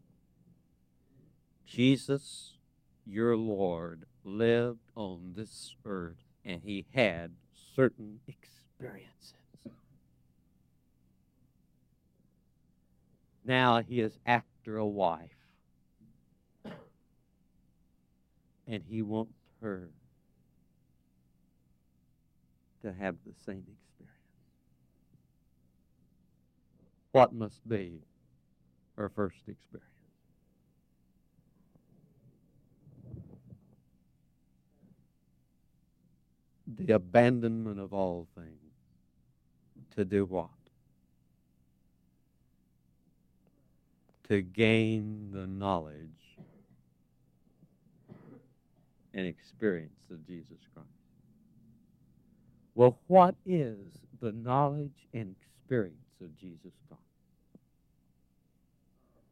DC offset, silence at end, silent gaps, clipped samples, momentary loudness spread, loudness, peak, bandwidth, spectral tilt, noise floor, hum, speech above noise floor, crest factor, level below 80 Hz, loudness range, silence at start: under 0.1%; 2.35 s; none; under 0.1%; 25 LU; -31 LUFS; -8 dBFS; 12 kHz; -7 dB/octave; -70 dBFS; none; 39 dB; 26 dB; -70 dBFS; 17 LU; 1.7 s